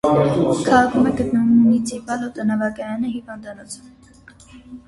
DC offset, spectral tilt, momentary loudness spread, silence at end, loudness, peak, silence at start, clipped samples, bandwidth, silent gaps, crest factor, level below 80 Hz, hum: under 0.1%; -6.5 dB/octave; 20 LU; 0.1 s; -18 LUFS; -2 dBFS; 0.05 s; under 0.1%; 11.5 kHz; none; 18 dB; -48 dBFS; none